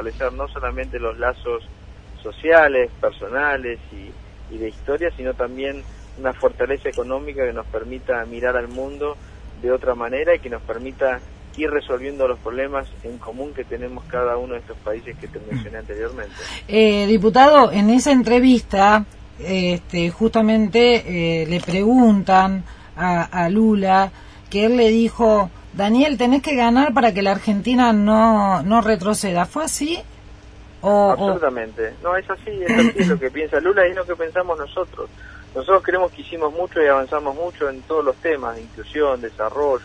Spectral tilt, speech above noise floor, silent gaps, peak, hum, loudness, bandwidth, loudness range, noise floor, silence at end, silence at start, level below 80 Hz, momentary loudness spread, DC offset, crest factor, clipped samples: -5.5 dB/octave; 23 dB; none; 0 dBFS; none; -18 LUFS; 11 kHz; 10 LU; -41 dBFS; 0 s; 0 s; -40 dBFS; 16 LU; under 0.1%; 18 dB; under 0.1%